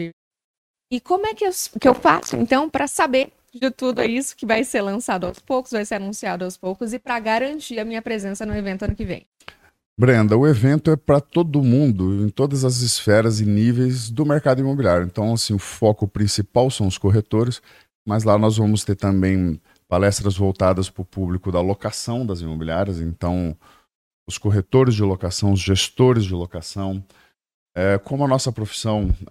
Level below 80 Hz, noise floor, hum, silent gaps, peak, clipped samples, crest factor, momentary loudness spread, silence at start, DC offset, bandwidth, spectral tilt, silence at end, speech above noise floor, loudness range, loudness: -40 dBFS; -47 dBFS; none; 0.13-0.31 s, 0.44-0.74 s, 9.26-9.32 s, 9.86-9.96 s, 17.95-18.05 s, 23.95-24.26 s, 27.54-27.66 s; 0 dBFS; under 0.1%; 20 dB; 11 LU; 0 s; under 0.1%; 14.5 kHz; -6 dB/octave; 0.05 s; 27 dB; 7 LU; -20 LUFS